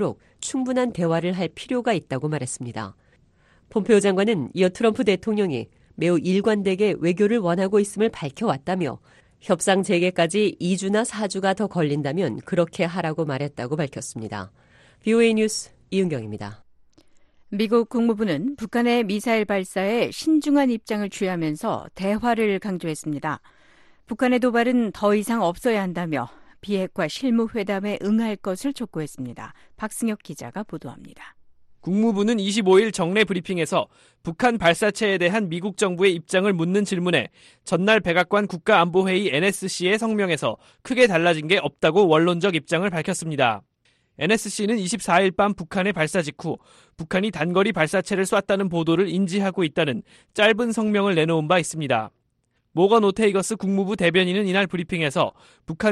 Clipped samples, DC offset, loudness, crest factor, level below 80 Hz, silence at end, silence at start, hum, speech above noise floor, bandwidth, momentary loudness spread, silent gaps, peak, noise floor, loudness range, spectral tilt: under 0.1%; under 0.1%; -22 LUFS; 18 dB; -58 dBFS; 0 s; 0 s; none; 48 dB; 12.5 kHz; 13 LU; none; -4 dBFS; -70 dBFS; 5 LU; -5 dB/octave